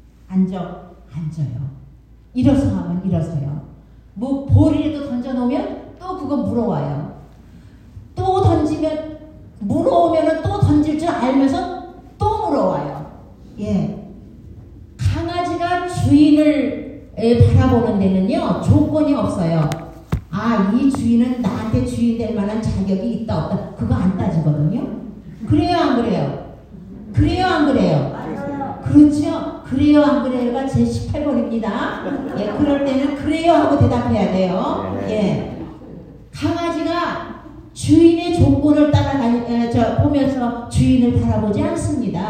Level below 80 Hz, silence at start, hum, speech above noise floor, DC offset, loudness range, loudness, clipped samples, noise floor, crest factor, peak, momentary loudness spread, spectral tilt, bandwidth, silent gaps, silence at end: -38 dBFS; 0.3 s; none; 27 dB; under 0.1%; 6 LU; -18 LUFS; under 0.1%; -44 dBFS; 16 dB; 0 dBFS; 16 LU; -8 dB/octave; 9.8 kHz; none; 0 s